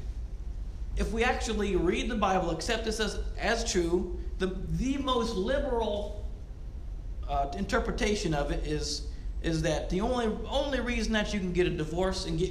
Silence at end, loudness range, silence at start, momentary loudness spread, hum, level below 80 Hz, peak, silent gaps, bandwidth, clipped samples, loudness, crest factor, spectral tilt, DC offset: 0 s; 3 LU; 0 s; 13 LU; none; -36 dBFS; -12 dBFS; none; 13.5 kHz; under 0.1%; -30 LUFS; 18 dB; -5 dB/octave; under 0.1%